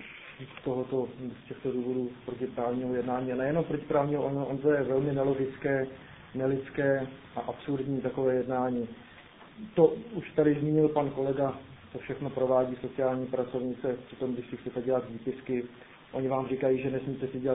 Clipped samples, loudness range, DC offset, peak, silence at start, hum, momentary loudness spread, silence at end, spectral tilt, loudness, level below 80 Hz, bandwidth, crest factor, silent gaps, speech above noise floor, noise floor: under 0.1%; 4 LU; under 0.1%; -8 dBFS; 0 s; none; 12 LU; 0 s; -5 dB/octave; -31 LUFS; -62 dBFS; 3.9 kHz; 22 dB; none; 22 dB; -52 dBFS